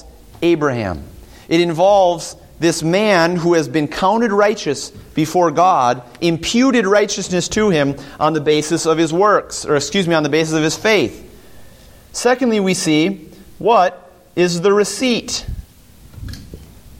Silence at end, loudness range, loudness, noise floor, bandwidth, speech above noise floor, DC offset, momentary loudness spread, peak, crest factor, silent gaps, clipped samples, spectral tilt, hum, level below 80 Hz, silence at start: 0.05 s; 3 LU; -16 LUFS; -43 dBFS; 16 kHz; 28 dB; under 0.1%; 12 LU; -2 dBFS; 16 dB; none; under 0.1%; -4.5 dB/octave; none; -42 dBFS; 0.05 s